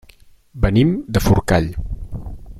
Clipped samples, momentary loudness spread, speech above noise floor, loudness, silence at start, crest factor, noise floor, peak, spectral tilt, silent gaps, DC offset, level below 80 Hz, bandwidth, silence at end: under 0.1%; 16 LU; 32 dB; -18 LUFS; 0.55 s; 16 dB; -48 dBFS; -2 dBFS; -7 dB/octave; none; under 0.1%; -28 dBFS; 15.5 kHz; 0 s